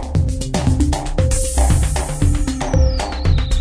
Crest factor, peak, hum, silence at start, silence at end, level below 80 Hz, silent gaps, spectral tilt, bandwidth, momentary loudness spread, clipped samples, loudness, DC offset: 14 dB; -2 dBFS; none; 0 s; 0 s; -18 dBFS; none; -5.5 dB/octave; 11 kHz; 4 LU; under 0.1%; -18 LUFS; under 0.1%